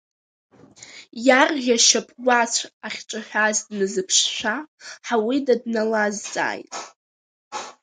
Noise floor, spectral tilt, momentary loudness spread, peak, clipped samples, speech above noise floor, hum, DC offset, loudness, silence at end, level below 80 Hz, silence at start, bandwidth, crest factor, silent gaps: -45 dBFS; -1.5 dB/octave; 19 LU; 0 dBFS; under 0.1%; 24 dB; none; under 0.1%; -20 LUFS; 0.1 s; -72 dBFS; 0.8 s; 10 kHz; 22 dB; 2.73-2.80 s, 4.68-4.78 s, 6.96-7.51 s